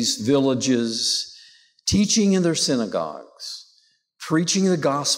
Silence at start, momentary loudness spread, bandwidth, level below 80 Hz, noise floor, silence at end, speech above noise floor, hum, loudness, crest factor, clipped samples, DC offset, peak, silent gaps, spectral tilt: 0 s; 16 LU; 16 kHz; -50 dBFS; -62 dBFS; 0 s; 41 dB; none; -21 LUFS; 12 dB; under 0.1%; under 0.1%; -10 dBFS; none; -4 dB/octave